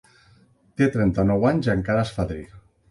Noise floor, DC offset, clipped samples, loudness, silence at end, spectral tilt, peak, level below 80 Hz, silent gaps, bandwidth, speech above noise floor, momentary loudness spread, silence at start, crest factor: -57 dBFS; under 0.1%; under 0.1%; -22 LUFS; 0.3 s; -8 dB/octave; -8 dBFS; -42 dBFS; none; 11.5 kHz; 36 dB; 10 LU; 0.8 s; 16 dB